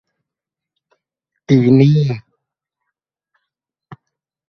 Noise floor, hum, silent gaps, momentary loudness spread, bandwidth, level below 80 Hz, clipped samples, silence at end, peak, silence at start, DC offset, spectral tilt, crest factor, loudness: -85 dBFS; none; none; 12 LU; 6.4 kHz; -56 dBFS; under 0.1%; 0.55 s; 0 dBFS; 1.5 s; under 0.1%; -9 dB/octave; 18 dB; -13 LUFS